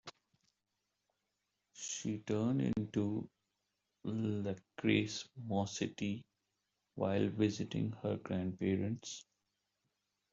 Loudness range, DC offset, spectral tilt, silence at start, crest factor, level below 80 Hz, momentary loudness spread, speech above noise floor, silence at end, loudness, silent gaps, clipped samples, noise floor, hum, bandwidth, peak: 2 LU; under 0.1%; -5.5 dB/octave; 0.05 s; 20 dB; -72 dBFS; 13 LU; 50 dB; 1.1 s; -38 LUFS; none; under 0.1%; -87 dBFS; none; 8 kHz; -18 dBFS